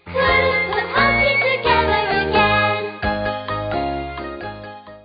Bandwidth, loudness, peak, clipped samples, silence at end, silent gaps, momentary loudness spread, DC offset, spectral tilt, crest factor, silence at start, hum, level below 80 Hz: 5.4 kHz; -17 LUFS; -4 dBFS; under 0.1%; 0.05 s; none; 15 LU; under 0.1%; -10 dB/octave; 14 dB; 0.05 s; none; -36 dBFS